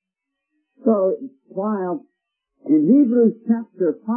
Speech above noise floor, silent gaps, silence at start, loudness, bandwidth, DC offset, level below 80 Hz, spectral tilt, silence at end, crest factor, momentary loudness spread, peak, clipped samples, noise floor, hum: 63 dB; none; 0.85 s; -19 LUFS; 2.4 kHz; under 0.1%; -76 dBFS; -15 dB/octave; 0 s; 16 dB; 15 LU; -4 dBFS; under 0.1%; -82 dBFS; none